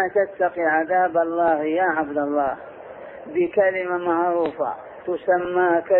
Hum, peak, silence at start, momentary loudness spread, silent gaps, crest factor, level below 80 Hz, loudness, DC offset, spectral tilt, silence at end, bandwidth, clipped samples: none; -6 dBFS; 0 s; 12 LU; none; 14 dB; -62 dBFS; -22 LUFS; under 0.1%; -10 dB/octave; 0 s; 4.2 kHz; under 0.1%